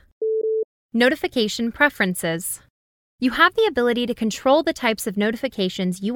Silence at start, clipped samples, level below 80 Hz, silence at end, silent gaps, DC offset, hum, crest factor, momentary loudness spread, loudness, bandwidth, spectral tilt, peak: 0.2 s; under 0.1%; -54 dBFS; 0 s; 0.64-0.89 s, 2.70-3.18 s; under 0.1%; none; 20 dB; 8 LU; -21 LUFS; 19 kHz; -4 dB/octave; -2 dBFS